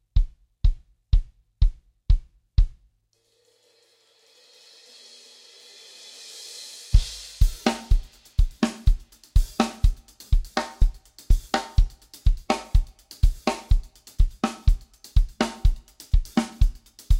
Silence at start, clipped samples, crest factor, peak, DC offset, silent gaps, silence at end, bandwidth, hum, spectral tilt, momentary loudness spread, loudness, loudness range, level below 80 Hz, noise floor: 0.15 s; under 0.1%; 20 dB; -4 dBFS; under 0.1%; none; 0 s; 12.5 kHz; none; -5.5 dB/octave; 20 LU; -27 LUFS; 7 LU; -24 dBFS; -68 dBFS